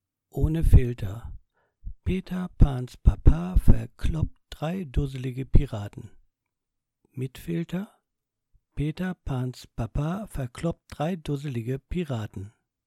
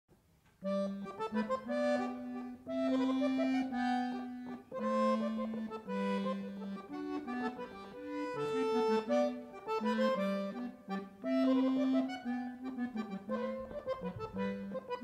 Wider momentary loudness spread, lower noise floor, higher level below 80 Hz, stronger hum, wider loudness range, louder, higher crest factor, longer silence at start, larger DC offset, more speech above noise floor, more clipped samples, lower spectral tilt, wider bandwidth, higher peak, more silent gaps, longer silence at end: first, 16 LU vs 11 LU; first, -83 dBFS vs -68 dBFS; first, -28 dBFS vs -70 dBFS; neither; first, 8 LU vs 3 LU; first, -28 LUFS vs -36 LUFS; about the same, 20 dB vs 16 dB; second, 0.35 s vs 0.6 s; neither; first, 59 dB vs 32 dB; neither; first, -8 dB/octave vs -6.5 dB/octave; first, 13 kHz vs 9.8 kHz; first, -6 dBFS vs -20 dBFS; neither; first, 0.35 s vs 0 s